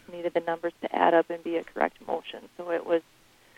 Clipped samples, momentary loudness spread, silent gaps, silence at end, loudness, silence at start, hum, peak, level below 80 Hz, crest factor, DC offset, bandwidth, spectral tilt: under 0.1%; 12 LU; none; 0.55 s; -28 LUFS; 0.1 s; none; -8 dBFS; -68 dBFS; 22 dB; under 0.1%; 12 kHz; -6 dB/octave